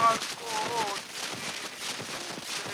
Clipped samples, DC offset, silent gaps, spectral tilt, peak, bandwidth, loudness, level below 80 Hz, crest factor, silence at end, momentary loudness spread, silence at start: under 0.1%; under 0.1%; none; -1.5 dB/octave; -10 dBFS; over 20 kHz; -32 LUFS; -70 dBFS; 20 dB; 0 s; 5 LU; 0 s